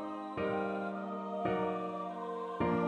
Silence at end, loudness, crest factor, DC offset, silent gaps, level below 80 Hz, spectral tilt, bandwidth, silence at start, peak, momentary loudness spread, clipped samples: 0 s; -37 LUFS; 16 dB; under 0.1%; none; -64 dBFS; -8 dB/octave; 9.4 kHz; 0 s; -20 dBFS; 6 LU; under 0.1%